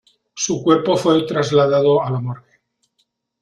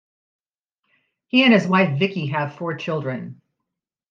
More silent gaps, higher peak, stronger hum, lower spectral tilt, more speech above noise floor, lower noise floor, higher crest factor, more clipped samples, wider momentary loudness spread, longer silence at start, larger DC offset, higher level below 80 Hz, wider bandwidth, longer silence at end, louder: neither; about the same, -4 dBFS vs -4 dBFS; neither; about the same, -5.5 dB/octave vs -6.5 dB/octave; second, 52 dB vs 63 dB; second, -68 dBFS vs -82 dBFS; about the same, 16 dB vs 20 dB; neither; second, 10 LU vs 14 LU; second, 0.35 s vs 1.35 s; neither; first, -58 dBFS vs -70 dBFS; first, 11.5 kHz vs 7.4 kHz; first, 1 s vs 0.75 s; first, -17 LUFS vs -20 LUFS